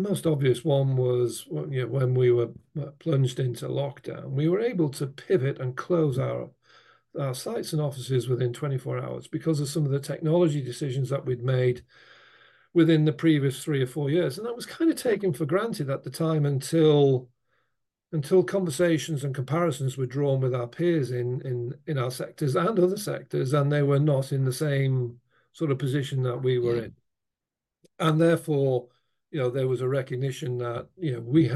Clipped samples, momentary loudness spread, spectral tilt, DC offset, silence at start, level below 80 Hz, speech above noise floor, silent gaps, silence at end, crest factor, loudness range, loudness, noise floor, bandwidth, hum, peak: under 0.1%; 10 LU; -7 dB/octave; under 0.1%; 0 s; -68 dBFS; 63 dB; none; 0 s; 16 dB; 4 LU; -26 LUFS; -89 dBFS; 12.5 kHz; none; -10 dBFS